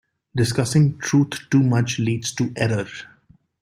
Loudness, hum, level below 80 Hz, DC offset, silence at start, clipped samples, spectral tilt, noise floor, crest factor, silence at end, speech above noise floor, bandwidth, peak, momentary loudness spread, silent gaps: -21 LUFS; none; -54 dBFS; under 0.1%; 0.35 s; under 0.1%; -5.5 dB/octave; -56 dBFS; 16 dB; 0.6 s; 36 dB; 15.5 kHz; -6 dBFS; 9 LU; none